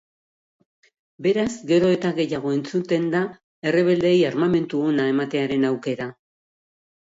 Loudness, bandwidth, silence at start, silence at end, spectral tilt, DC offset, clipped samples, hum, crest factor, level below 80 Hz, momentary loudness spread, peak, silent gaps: -22 LUFS; 7.8 kHz; 1.2 s; 0.9 s; -6.5 dB/octave; under 0.1%; under 0.1%; none; 16 dB; -62 dBFS; 8 LU; -8 dBFS; 3.44-3.62 s